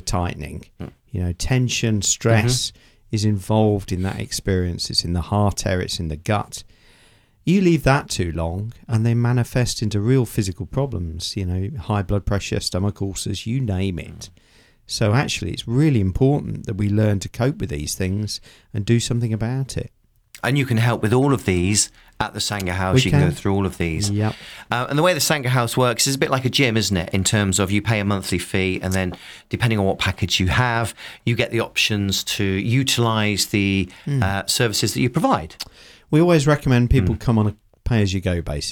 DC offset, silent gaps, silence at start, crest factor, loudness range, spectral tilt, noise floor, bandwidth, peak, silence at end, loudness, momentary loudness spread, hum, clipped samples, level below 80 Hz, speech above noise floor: under 0.1%; none; 0.05 s; 20 dB; 4 LU; -5 dB/octave; -54 dBFS; 19 kHz; -2 dBFS; 0 s; -20 LUFS; 10 LU; none; under 0.1%; -38 dBFS; 34 dB